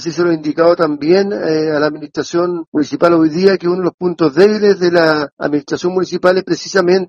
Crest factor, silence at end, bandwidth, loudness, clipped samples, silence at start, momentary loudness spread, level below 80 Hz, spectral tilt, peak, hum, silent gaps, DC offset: 14 dB; 0 s; 7.4 kHz; -14 LUFS; under 0.1%; 0 s; 7 LU; -58 dBFS; -6 dB/octave; 0 dBFS; none; 2.67-2.72 s, 3.94-3.98 s, 5.32-5.37 s; under 0.1%